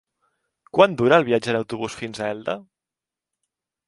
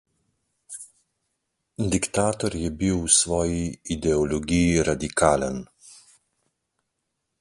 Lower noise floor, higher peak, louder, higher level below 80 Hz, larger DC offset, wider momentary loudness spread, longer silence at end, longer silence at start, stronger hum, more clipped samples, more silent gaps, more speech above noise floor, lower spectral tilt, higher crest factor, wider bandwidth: first, -88 dBFS vs -79 dBFS; about the same, 0 dBFS vs -2 dBFS; about the same, -21 LUFS vs -23 LUFS; second, -60 dBFS vs -42 dBFS; neither; second, 13 LU vs 19 LU; second, 1.25 s vs 1.45 s; about the same, 0.75 s vs 0.7 s; neither; neither; neither; first, 68 dB vs 56 dB; first, -5.5 dB/octave vs -4 dB/octave; about the same, 24 dB vs 22 dB; about the same, 11.5 kHz vs 11.5 kHz